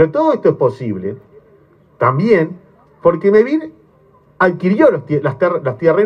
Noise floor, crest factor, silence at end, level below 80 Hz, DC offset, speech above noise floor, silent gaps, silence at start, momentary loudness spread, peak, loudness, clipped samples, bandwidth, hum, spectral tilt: -50 dBFS; 14 dB; 0 s; -56 dBFS; under 0.1%; 36 dB; none; 0 s; 11 LU; 0 dBFS; -15 LUFS; under 0.1%; 6.8 kHz; none; -9 dB/octave